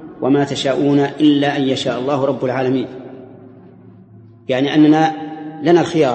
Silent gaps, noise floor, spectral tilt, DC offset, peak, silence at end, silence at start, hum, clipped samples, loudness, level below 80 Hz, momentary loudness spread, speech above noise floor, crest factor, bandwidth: none; -42 dBFS; -6.5 dB/octave; under 0.1%; 0 dBFS; 0 s; 0 s; none; under 0.1%; -16 LUFS; -60 dBFS; 16 LU; 27 dB; 16 dB; 8.6 kHz